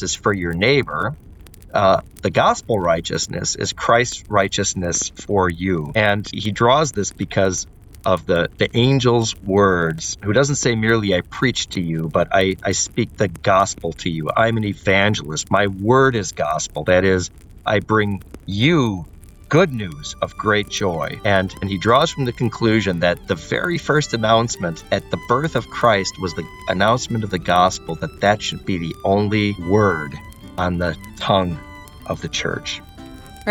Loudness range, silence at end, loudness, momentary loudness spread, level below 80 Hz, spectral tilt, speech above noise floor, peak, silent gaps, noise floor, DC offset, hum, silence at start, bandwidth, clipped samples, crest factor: 2 LU; 0 s; -19 LUFS; 10 LU; -42 dBFS; -4.5 dB/octave; 19 dB; -2 dBFS; none; -38 dBFS; under 0.1%; none; 0 s; 17.5 kHz; under 0.1%; 16 dB